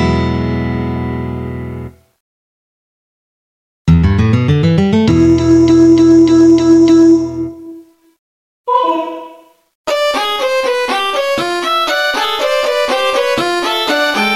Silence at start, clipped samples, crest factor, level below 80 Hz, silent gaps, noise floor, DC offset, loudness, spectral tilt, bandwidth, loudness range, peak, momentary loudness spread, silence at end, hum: 0 s; under 0.1%; 12 dB; -32 dBFS; 2.20-3.85 s, 8.18-8.64 s, 9.75-9.84 s; -39 dBFS; under 0.1%; -12 LUFS; -6 dB/octave; 13.5 kHz; 11 LU; 0 dBFS; 16 LU; 0 s; none